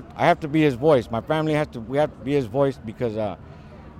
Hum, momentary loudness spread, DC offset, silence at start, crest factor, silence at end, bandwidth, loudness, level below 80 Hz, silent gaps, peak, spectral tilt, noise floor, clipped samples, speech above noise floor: none; 10 LU; under 0.1%; 0 s; 16 dB; 0 s; 13.5 kHz; -23 LUFS; -48 dBFS; none; -6 dBFS; -7.5 dB/octave; -42 dBFS; under 0.1%; 20 dB